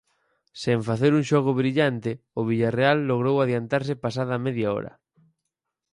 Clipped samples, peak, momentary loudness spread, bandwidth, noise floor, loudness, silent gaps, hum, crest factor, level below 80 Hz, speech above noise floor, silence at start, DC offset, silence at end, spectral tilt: under 0.1%; -6 dBFS; 9 LU; 11 kHz; -83 dBFS; -24 LUFS; none; none; 18 dB; -62 dBFS; 60 dB; 0.55 s; under 0.1%; 1.05 s; -7 dB/octave